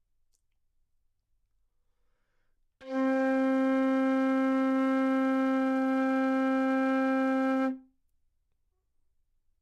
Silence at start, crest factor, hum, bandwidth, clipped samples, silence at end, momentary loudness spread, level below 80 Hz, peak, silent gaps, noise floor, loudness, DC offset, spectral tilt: 2.8 s; 10 dB; none; 7 kHz; under 0.1%; 1.8 s; 3 LU; -76 dBFS; -20 dBFS; none; -75 dBFS; -28 LUFS; under 0.1%; -5.5 dB/octave